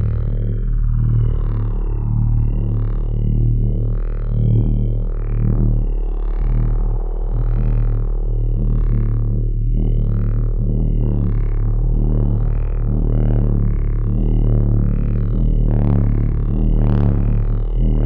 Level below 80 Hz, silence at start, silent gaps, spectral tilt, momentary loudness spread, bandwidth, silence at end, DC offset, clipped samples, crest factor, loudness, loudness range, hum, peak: -18 dBFS; 0 s; none; -11.5 dB/octave; 5 LU; 2.4 kHz; 0 s; under 0.1%; under 0.1%; 12 dB; -20 LUFS; 3 LU; none; -4 dBFS